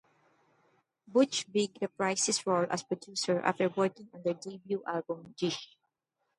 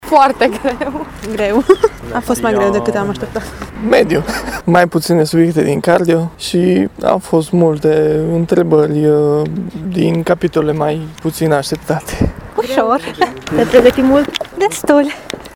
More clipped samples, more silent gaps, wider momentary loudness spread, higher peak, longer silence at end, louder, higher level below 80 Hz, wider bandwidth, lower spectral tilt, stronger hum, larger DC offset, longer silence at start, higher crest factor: second, under 0.1% vs 0.1%; neither; about the same, 9 LU vs 9 LU; second, -12 dBFS vs 0 dBFS; first, 0.75 s vs 0 s; second, -32 LUFS vs -14 LUFS; second, -80 dBFS vs -36 dBFS; second, 11.5 kHz vs 18 kHz; second, -3.5 dB/octave vs -6 dB/octave; neither; neither; first, 1.1 s vs 0 s; first, 22 dB vs 14 dB